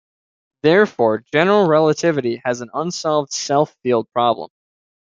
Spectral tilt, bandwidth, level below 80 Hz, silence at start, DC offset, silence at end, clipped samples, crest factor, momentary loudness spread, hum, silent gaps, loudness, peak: -5 dB/octave; 7.6 kHz; -64 dBFS; 0.65 s; under 0.1%; 0.55 s; under 0.1%; 16 dB; 9 LU; none; none; -18 LUFS; -2 dBFS